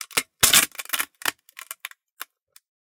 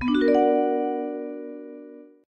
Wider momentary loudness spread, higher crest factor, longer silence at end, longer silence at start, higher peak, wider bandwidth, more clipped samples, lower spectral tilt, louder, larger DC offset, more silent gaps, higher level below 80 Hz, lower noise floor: first, 25 LU vs 21 LU; first, 26 dB vs 16 dB; first, 0.65 s vs 0.25 s; about the same, 0 s vs 0 s; first, 0 dBFS vs -10 dBFS; first, 19 kHz vs 6.8 kHz; neither; second, 1 dB/octave vs -7 dB/octave; first, -20 LUFS vs -23 LUFS; neither; first, 2.12-2.17 s vs none; about the same, -56 dBFS vs -58 dBFS; about the same, -44 dBFS vs -44 dBFS